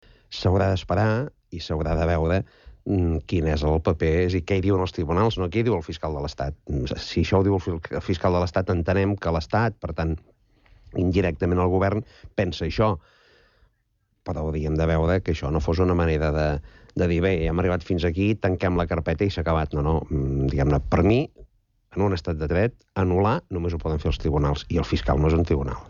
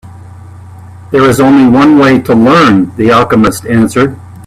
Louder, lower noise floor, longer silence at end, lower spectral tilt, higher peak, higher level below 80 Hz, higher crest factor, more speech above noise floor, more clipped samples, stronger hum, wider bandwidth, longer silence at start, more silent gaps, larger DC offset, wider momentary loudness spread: second, -24 LUFS vs -7 LUFS; first, -70 dBFS vs -29 dBFS; about the same, 0 s vs 0.05 s; first, -8 dB/octave vs -6 dB/octave; second, -8 dBFS vs 0 dBFS; about the same, -34 dBFS vs -38 dBFS; first, 16 dB vs 8 dB; first, 47 dB vs 23 dB; second, under 0.1% vs 0.1%; neither; second, 7.2 kHz vs 14.5 kHz; first, 0.3 s vs 0.05 s; neither; neither; about the same, 8 LU vs 6 LU